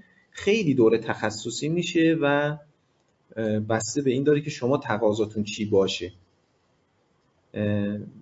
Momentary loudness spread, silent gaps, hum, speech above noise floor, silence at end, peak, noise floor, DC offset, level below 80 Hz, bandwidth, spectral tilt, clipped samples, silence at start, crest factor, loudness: 10 LU; none; none; 43 dB; 0 s; -8 dBFS; -67 dBFS; under 0.1%; -64 dBFS; 8 kHz; -5.5 dB/octave; under 0.1%; 0.35 s; 18 dB; -25 LUFS